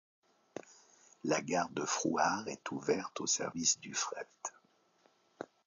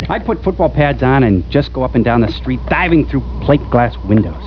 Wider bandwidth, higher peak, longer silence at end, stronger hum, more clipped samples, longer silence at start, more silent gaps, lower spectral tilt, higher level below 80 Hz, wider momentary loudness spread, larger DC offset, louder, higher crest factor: first, 7.8 kHz vs 5.4 kHz; second, -16 dBFS vs 0 dBFS; first, 0.2 s vs 0 s; neither; neither; first, 0.55 s vs 0 s; neither; second, -2.5 dB/octave vs -9.5 dB/octave; second, -76 dBFS vs -26 dBFS; first, 19 LU vs 6 LU; second, under 0.1% vs 0.4%; second, -35 LUFS vs -14 LUFS; first, 22 dB vs 14 dB